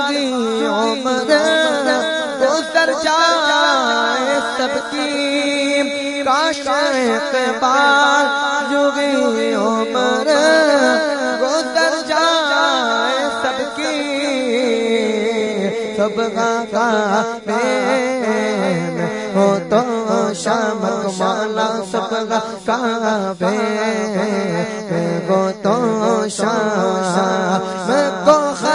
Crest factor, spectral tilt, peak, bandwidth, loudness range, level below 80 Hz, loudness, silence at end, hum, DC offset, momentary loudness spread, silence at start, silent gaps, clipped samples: 16 dB; -4 dB/octave; 0 dBFS; 11 kHz; 4 LU; -60 dBFS; -16 LUFS; 0 s; none; under 0.1%; 6 LU; 0 s; none; under 0.1%